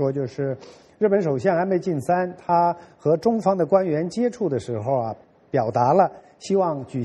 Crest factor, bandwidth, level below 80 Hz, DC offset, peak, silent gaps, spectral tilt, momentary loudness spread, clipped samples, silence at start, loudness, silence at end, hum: 18 dB; 11.5 kHz; -62 dBFS; under 0.1%; -4 dBFS; none; -7.5 dB/octave; 8 LU; under 0.1%; 0 s; -22 LUFS; 0 s; none